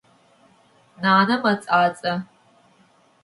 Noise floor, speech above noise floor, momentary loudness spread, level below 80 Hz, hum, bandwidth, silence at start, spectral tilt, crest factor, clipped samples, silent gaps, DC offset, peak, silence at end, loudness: -58 dBFS; 38 dB; 10 LU; -70 dBFS; none; 11.5 kHz; 1 s; -6 dB/octave; 20 dB; under 0.1%; none; under 0.1%; -4 dBFS; 1 s; -20 LUFS